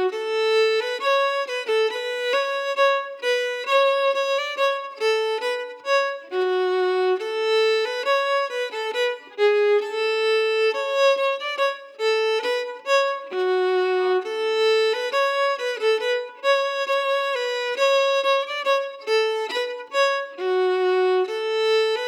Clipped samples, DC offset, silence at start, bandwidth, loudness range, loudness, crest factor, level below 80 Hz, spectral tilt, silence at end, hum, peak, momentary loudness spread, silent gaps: under 0.1%; under 0.1%; 0 s; 16.5 kHz; 1 LU; -22 LUFS; 12 dB; under -90 dBFS; 0 dB/octave; 0 s; none; -10 dBFS; 6 LU; none